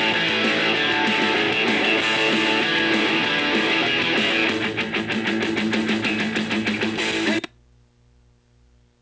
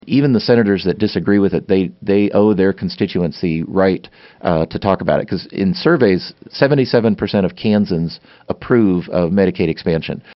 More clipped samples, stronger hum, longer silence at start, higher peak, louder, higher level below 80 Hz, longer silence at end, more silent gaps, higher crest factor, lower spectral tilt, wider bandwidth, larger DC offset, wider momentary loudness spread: neither; first, 60 Hz at -50 dBFS vs none; about the same, 0 s vs 0.05 s; second, -8 dBFS vs 0 dBFS; second, -20 LUFS vs -16 LUFS; second, -56 dBFS vs -44 dBFS; first, 1.55 s vs 0.05 s; neither; about the same, 14 dB vs 16 dB; second, -3.5 dB/octave vs -6 dB/octave; first, 8 kHz vs 6 kHz; neither; about the same, 5 LU vs 7 LU